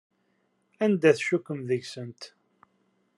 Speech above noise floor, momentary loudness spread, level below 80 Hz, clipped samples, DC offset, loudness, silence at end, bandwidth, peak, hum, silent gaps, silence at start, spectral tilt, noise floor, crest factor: 46 dB; 20 LU; -80 dBFS; under 0.1%; under 0.1%; -26 LUFS; 0.9 s; 11.5 kHz; -6 dBFS; none; none; 0.8 s; -6 dB/octave; -72 dBFS; 22 dB